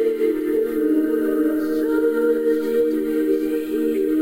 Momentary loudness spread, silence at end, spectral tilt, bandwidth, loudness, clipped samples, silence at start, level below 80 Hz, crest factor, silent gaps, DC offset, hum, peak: 2 LU; 0 s; -5.5 dB/octave; 16 kHz; -20 LUFS; under 0.1%; 0 s; -52 dBFS; 10 dB; none; 0.2%; none; -10 dBFS